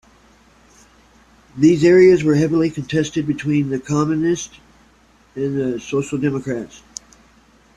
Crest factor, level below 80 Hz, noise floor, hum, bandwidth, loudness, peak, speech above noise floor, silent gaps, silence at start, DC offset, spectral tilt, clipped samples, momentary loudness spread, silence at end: 16 dB; -52 dBFS; -53 dBFS; none; 10 kHz; -17 LUFS; -2 dBFS; 36 dB; none; 1.55 s; under 0.1%; -6.5 dB/octave; under 0.1%; 22 LU; 1 s